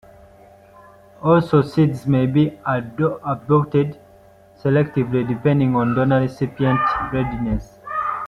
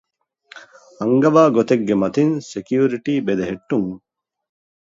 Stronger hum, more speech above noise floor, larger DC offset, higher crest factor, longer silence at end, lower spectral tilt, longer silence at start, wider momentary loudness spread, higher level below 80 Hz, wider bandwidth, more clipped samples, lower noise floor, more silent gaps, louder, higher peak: neither; about the same, 30 dB vs 32 dB; neither; about the same, 16 dB vs 18 dB; second, 0 s vs 0.85 s; first, -9 dB/octave vs -7 dB/octave; first, 1.2 s vs 0.55 s; second, 8 LU vs 12 LU; first, -42 dBFS vs -58 dBFS; first, 9.6 kHz vs 7.8 kHz; neither; about the same, -48 dBFS vs -50 dBFS; neither; about the same, -19 LUFS vs -18 LUFS; about the same, -2 dBFS vs -2 dBFS